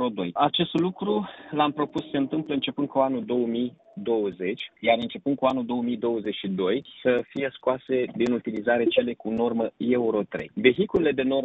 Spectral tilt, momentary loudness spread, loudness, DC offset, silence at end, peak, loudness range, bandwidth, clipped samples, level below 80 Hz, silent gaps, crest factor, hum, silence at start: -4 dB/octave; 6 LU; -26 LUFS; under 0.1%; 0 s; -4 dBFS; 2 LU; 8 kHz; under 0.1%; -60 dBFS; none; 22 dB; none; 0 s